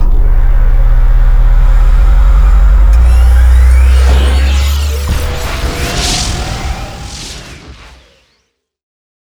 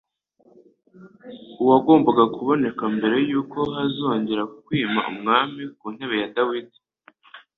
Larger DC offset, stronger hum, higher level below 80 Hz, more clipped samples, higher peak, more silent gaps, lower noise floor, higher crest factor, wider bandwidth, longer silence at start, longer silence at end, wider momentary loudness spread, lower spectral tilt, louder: neither; neither; first, -8 dBFS vs -64 dBFS; neither; about the same, 0 dBFS vs -2 dBFS; neither; about the same, -61 dBFS vs -59 dBFS; second, 8 dB vs 20 dB; first, 14.5 kHz vs 4.2 kHz; second, 0 s vs 1 s; first, 1.6 s vs 0.2 s; about the same, 15 LU vs 16 LU; second, -4.5 dB/octave vs -8.5 dB/octave; first, -11 LUFS vs -21 LUFS